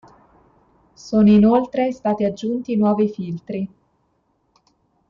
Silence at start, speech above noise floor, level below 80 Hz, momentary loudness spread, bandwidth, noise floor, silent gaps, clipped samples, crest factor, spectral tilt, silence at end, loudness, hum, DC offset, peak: 1.05 s; 48 dB; -52 dBFS; 15 LU; 7.2 kHz; -66 dBFS; none; under 0.1%; 14 dB; -8.5 dB/octave; 1.45 s; -19 LUFS; none; under 0.1%; -6 dBFS